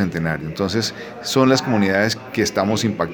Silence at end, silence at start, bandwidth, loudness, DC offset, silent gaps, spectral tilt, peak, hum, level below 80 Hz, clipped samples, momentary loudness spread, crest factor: 0 s; 0 s; over 20 kHz; -19 LUFS; under 0.1%; none; -5 dB/octave; -2 dBFS; none; -50 dBFS; under 0.1%; 8 LU; 18 dB